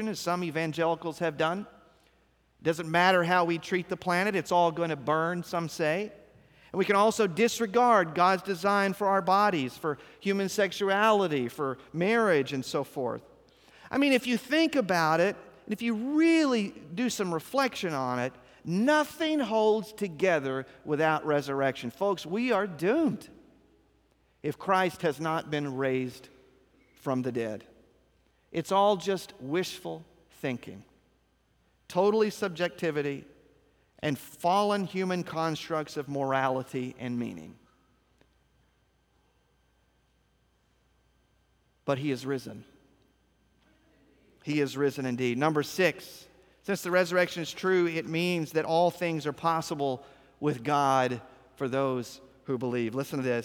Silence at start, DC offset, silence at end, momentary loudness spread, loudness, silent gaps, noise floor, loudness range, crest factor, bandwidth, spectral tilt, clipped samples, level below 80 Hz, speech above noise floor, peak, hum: 0 s; under 0.1%; 0 s; 11 LU; -28 LUFS; none; -69 dBFS; 8 LU; 20 dB; 20 kHz; -5 dB/octave; under 0.1%; -70 dBFS; 41 dB; -10 dBFS; none